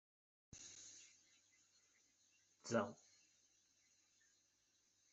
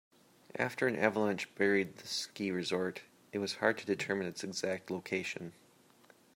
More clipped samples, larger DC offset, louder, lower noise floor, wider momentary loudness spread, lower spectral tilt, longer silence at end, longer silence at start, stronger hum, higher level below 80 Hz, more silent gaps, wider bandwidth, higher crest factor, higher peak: neither; neither; second, -47 LUFS vs -35 LUFS; first, -81 dBFS vs -65 dBFS; first, 21 LU vs 10 LU; about the same, -4 dB/octave vs -4 dB/octave; first, 2.15 s vs 0.85 s; about the same, 0.55 s vs 0.55 s; neither; second, -88 dBFS vs -80 dBFS; neither; second, 8.2 kHz vs 16 kHz; first, 30 dB vs 24 dB; second, -24 dBFS vs -12 dBFS